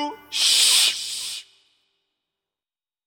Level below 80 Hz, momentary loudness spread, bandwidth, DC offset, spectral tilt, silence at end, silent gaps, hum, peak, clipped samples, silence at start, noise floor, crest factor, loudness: -78 dBFS; 17 LU; 17 kHz; under 0.1%; 3 dB/octave; 1.65 s; none; none; -4 dBFS; under 0.1%; 0 s; under -90 dBFS; 22 dB; -17 LUFS